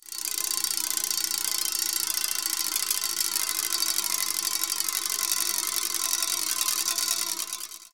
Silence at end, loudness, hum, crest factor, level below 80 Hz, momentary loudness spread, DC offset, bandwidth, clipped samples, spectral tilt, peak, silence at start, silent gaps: 0 s; -25 LUFS; none; 24 dB; -80 dBFS; 2 LU; 0.2%; 17.5 kHz; under 0.1%; 3 dB/octave; -6 dBFS; 0 s; none